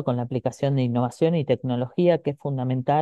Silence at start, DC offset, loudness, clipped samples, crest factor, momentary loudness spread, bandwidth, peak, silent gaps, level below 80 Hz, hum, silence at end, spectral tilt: 0 s; under 0.1%; -24 LUFS; under 0.1%; 16 dB; 6 LU; 9.4 kHz; -8 dBFS; none; -64 dBFS; none; 0 s; -8 dB/octave